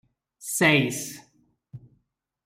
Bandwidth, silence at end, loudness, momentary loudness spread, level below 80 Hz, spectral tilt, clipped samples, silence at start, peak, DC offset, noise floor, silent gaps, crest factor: 16 kHz; 0.7 s; -22 LUFS; 20 LU; -66 dBFS; -3.5 dB/octave; under 0.1%; 0.4 s; -6 dBFS; under 0.1%; -73 dBFS; none; 22 dB